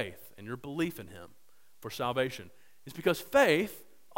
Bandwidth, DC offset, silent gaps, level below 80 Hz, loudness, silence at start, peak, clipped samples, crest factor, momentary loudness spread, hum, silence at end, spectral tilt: 16.5 kHz; 0.2%; none; -64 dBFS; -31 LUFS; 0 s; -10 dBFS; under 0.1%; 22 dB; 22 LU; none; 0.35 s; -4.5 dB/octave